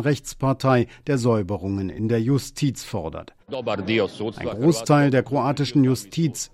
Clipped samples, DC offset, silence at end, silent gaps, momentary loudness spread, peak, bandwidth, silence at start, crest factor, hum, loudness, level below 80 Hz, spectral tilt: under 0.1%; under 0.1%; 0.05 s; none; 11 LU; -6 dBFS; 15 kHz; 0 s; 16 dB; none; -22 LUFS; -52 dBFS; -6 dB/octave